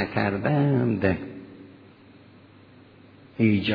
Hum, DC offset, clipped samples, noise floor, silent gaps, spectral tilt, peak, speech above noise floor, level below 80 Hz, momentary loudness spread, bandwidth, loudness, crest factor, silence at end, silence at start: none; under 0.1%; under 0.1%; -51 dBFS; none; -10 dB/octave; -8 dBFS; 28 dB; -56 dBFS; 23 LU; 5.2 kHz; -24 LUFS; 20 dB; 0 s; 0 s